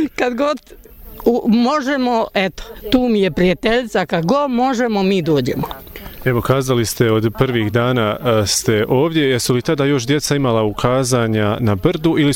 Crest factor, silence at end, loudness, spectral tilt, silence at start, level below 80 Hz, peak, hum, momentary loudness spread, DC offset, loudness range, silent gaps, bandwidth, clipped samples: 14 dB; 0 s; -16 LUFS; -5.5 dB/octave; 0 s; -40 dBFS; -2 dBFS; none; 5 LU; under 0.1%; 2 LU; none; 17.5 kHz; under 0.1%